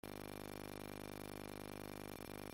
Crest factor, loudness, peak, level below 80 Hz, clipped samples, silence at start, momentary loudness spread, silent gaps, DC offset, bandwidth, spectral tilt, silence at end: 16 dB; -50 LUFS; -34 dBFS; -64 dBFS; under 0.1%; 0.05 s; 0 LU; none; under 0.1%; 17 kHz; -4.5 dB/octave; 0 s